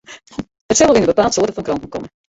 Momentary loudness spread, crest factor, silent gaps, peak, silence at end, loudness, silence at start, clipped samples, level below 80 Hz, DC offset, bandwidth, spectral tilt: 19 LU; 16 dB; 0.61-0.69 s; -2 dBFS; 0.3 s; -15 LUFS; 0.1 s; under 0.1%; -44 dBFS; under 0.1%; 8 kHz; -3.5 dB/octave